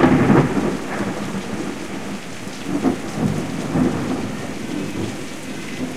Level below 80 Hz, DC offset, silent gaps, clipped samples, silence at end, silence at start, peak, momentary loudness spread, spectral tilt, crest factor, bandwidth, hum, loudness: -44 dBFS; 2%; none; under 0.1%; 0 s; 0 s; 0 dBFS; 14 LU; -6 dB/octave; 20 dB; 15 kHz; none; -22 LUFS